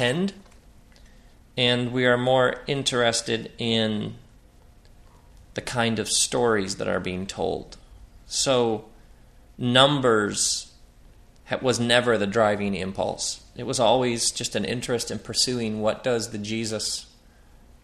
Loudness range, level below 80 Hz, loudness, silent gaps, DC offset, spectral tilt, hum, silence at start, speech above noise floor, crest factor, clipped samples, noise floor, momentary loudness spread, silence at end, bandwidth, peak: 4 LU; -52 dBFS; -24 LUFS; none; under 0.1%; -3.5 dB/octave; none; 0 s; 29 dB; 24 dB; under 0.1%; -52 dBFS; 10 LU; 0.8 s; 14 kHz; -2 dBFS